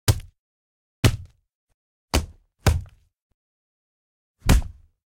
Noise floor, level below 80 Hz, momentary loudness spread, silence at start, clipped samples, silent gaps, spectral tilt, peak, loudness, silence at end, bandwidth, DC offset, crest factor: under -90 dBFS; -30 dBFS; 14 LU; 0.05 s; under 0.1%; 0.39-1.03 s, 1.54-1.67 s, 1.74-2.08 s, 3.22-4.34 s; -5 dB/octave; -6 dBFS; -25 LUFS; 0.35 s; 16.5 kHz; under 0.1%; 20 dB